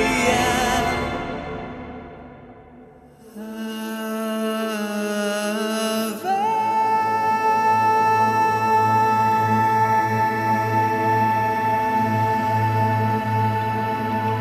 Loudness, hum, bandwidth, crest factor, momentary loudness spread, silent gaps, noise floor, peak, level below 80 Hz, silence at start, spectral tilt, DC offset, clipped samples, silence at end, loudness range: -20 LUFS; none; 14.5 kHz; 16 dB; 12 LU; none; -46 dBFS; -4 dBFS; -46 dBFS; 0 s; -5 dB/octave; under 0.1%; under 0.1%; 0 s; 11 LU